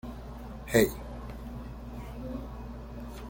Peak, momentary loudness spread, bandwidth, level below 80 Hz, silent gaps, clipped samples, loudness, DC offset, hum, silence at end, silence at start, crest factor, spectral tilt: -8 dBFS; 17 LU; 17 kHz; -44 dBFS; none; under 0.1%; -34 LUFS; under 0.1%; 60 Hz at -50 dBFS; 0 s; 0.05 s; 26 dB; -5.5 dB/octave